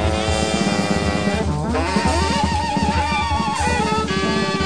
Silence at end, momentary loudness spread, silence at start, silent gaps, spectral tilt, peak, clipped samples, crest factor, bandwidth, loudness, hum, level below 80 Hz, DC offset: 0 s; 2 LU; 0 s; none; -5 dB/octave; -6 dBFS; under 0.1%; 14 dB; 10.5 kHz; -19 LUFS; none; -30 dBFS; 0.8%